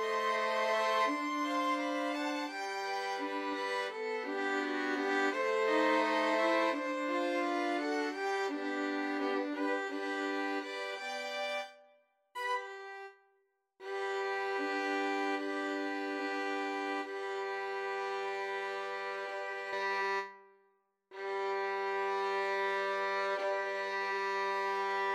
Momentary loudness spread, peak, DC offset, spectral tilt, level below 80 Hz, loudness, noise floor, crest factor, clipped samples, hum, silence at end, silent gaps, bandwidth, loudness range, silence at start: 8 LU; -18 dBFS; under 0.1%; -2.5 dB/octave; under -90 dBFS; -34 LUFS; -76 dBFS; 18 dB; under 0.1%; none; 0 s; none; 13.5 kHz; 6 LU; 0 s